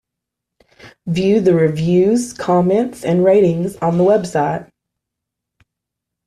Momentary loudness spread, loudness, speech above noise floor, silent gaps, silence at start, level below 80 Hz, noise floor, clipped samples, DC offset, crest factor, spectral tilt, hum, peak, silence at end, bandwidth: 7 LU; -15 LUFS; 67 dB; none; 0.85 s; -52 dBFS; -81 dBFS; under 0.1%; under 0.1%; 14 dB; -7 dB/octave; none; -4 dBFS; 1.65 s; 13 kHz